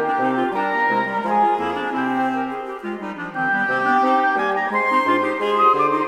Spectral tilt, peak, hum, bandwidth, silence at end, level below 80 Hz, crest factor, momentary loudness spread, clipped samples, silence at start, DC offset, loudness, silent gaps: -5.5 dB/octave; -4 dBFS; none; 12.5 kHz; 0 s; -60 dBFS; 16 dB; 11 LU; under 0.1%; 0 s; under 0.1%; -20 LUFS; none